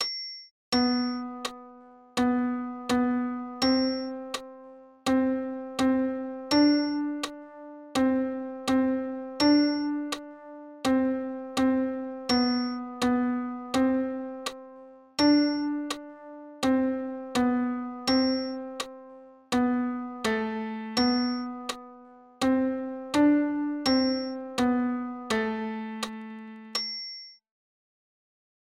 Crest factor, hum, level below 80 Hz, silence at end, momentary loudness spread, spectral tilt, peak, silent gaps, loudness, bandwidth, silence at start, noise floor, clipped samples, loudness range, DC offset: 16 dB; none; -60 dBFS; 1.4 s; 14 LU; -4 dB/octave; -12 dBFS; 0.51-0.72 s; -28 LUFS; 15 kHz; 0 s; -51 dBFS; under 0.1%; 2 LU; under 0.1%